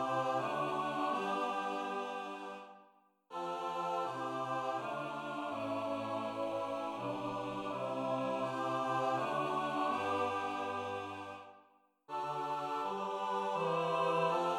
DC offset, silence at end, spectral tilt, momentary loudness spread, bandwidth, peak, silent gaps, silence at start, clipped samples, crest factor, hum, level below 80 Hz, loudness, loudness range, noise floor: under 0.1%; 0 s; -5.5 dB/octave; 8 LU; 15.5 kHz; -22 dBFS; none; 0 s; under 0.1%; 16 dB; none; -78 dBFS; -37 LUFS; 4 LU; -68 dBFS